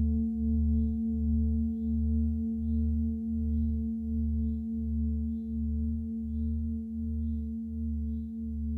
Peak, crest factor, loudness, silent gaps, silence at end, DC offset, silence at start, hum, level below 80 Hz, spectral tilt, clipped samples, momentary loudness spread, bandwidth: -20 dBFS; 10 dB; -32 LUFS; none; 0 s; under 0.1%; 0 s; none; -34 dBFS; -13.5 dB/octave; under 0.1%; 6 LU; 0.8 kHz